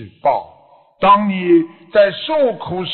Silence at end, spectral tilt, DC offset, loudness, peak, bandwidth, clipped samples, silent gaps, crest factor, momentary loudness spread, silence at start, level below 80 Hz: 0 s; -9 dB/octave; under 0.1%; -15 LUFS; -2 dBFS; 4.4 kHz; under 0.1%; none; 14 dB; 6 LU; 0 s; -52 dBFS